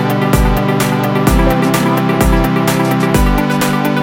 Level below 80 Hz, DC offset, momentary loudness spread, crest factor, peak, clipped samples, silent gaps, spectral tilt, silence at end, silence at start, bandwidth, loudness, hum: -20 dBFS; under 0.1%; 2 LU; 12 dB; 0 dBFS; under 0.1%; none; -6 dB/octave; 0 s; 0 s; 17 kHz; -13 LUFS; none